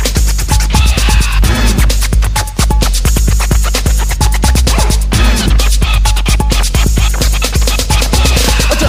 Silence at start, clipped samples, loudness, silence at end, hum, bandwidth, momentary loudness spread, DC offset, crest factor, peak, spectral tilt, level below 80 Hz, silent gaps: 0 s; under 0.1%; -11 LUFS; 0 s; none; 16 kHz; 3 LU; under 0.1%; 10 dB; 0 dBFS; -4 dB/octave; -10 dBFS; none